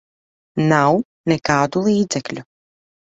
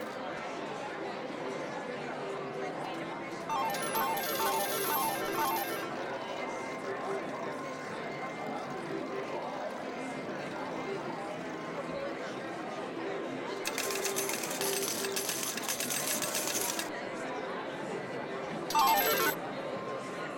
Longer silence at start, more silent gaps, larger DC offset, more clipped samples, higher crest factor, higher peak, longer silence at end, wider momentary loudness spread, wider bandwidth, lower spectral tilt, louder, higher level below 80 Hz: first, 0.55 s vs 0 s; first, 1.05-1.24 s vs none; neither; neither; about the same, 18 dB vs 18 dB; first, -2 dBFS vs -16 dBFS; first, 0.7 s vs 0 s; first, 13 LU vs 8 LU; second, 8.2 kHz vs 19 kHz; first, -5.5 dB/octave vs -2.5 dB/octave; first, -18 LUFS vs -34 LUFS; first, -54 dBFS vs -72 dBFS